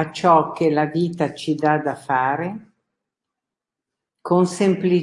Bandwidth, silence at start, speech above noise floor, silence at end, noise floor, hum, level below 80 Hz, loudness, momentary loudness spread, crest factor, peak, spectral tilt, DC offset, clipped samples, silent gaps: 11.5 kHz; 0 s; 67 dB; 0 s; -86 dBFS; none; -66 dBFS; -20 LUFS; 9 LU; 18 dB; -2 dBFS; -6.5 dB/octave; under 0.1%; under 0.1%; none